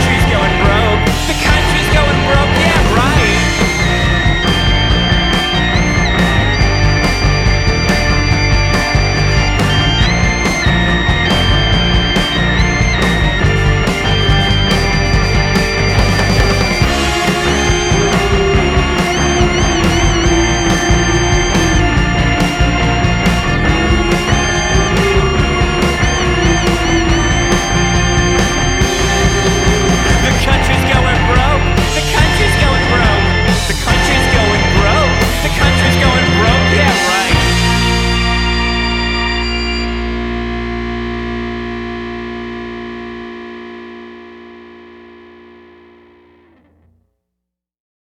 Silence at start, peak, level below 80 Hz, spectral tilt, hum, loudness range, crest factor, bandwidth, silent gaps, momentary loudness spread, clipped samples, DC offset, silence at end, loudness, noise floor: 0 s; 0 dBFS; -18 dBFS; -4.5 dB/octave; none; 6 LU; 12 dB; 15.5 kHz; none; 6 LU; under 0.1%; under 0.1%; 3 s; -12 LUFS; -78 dBFS